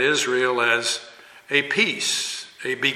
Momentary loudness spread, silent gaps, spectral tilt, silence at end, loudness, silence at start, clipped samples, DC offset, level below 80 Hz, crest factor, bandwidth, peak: 10 LU; none; -1.5 dB/octave; 0 s; -21 LUFS; 0 s; under 0.1%; under 0.1%; -74 dBFS; 18 dB; 14.5 kHz; -6 dBFS